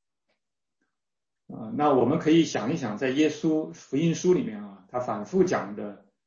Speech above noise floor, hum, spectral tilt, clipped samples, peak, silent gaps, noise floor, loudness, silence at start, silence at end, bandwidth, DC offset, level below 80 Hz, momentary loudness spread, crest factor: 65 dB; none; -6 dB/octave; under 0.1%; -10 dBFS; none; -90 dBFS; -26 LUFS; 1.5 s; 0.3 s; 7.4 kHz; under 0.1%; -66 dBFS; 15 LU; 18 dB